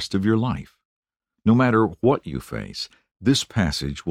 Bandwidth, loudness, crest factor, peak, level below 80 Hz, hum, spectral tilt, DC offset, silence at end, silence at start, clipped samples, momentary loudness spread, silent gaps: 15.5 kHz; -22 LUFS; 18 dB; -6 dBFS; -44 dBFS; none; -6 dB/octave; under 0.1%; 0 s; 0 s; under 0.1%; 14 LU; 0.85-1.03 s, 3.11-3.15 s